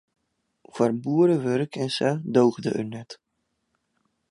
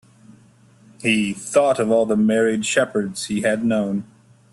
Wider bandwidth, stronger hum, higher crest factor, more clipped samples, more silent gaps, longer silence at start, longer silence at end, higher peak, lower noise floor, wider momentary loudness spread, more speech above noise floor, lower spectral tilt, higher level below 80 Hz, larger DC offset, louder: second, 11 kHz vs 12.5 kHz; neither; about the same, 20 dB vs 16 dB; neither; neither; second, 0.75 s vs 1 s; first, 1.15 s vs 0.5 s; about the same, -6 dBFS vs -4 dBFS; first, -76 dBFS vs -52 dBFS; first, 16 LU vs 7 LU; first, 53 dB vs 32 dB; first, -6.5 dB/octave vs -4.5 dB/octave; second, -70 dBFS vs -60 dBFS; neither; second, -24 LUFS vs -20 LUFS